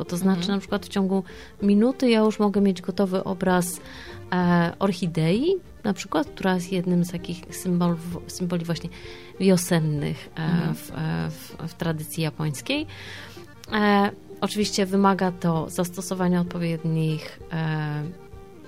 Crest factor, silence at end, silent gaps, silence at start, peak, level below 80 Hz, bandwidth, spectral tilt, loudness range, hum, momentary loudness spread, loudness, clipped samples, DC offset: 16 dB; 0 s; none; 0 s; -8 dBFS; -52 dBFS; 16 kHz; -6 dB/octave; 4 LU; none; 13 LU; -24 LUFS; under 0.1%; 0.3%